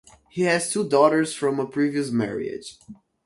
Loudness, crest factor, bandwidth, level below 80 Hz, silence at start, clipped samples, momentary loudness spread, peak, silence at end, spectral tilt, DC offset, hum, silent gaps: -23 LUFS; 20 dB; 11.5 kHz; -64 dBFS; 0.35 s; under 0.1%; 16 LU; -4 dBFS; 0.3 s; -4.5 dB/octave; under 0.1%; none; none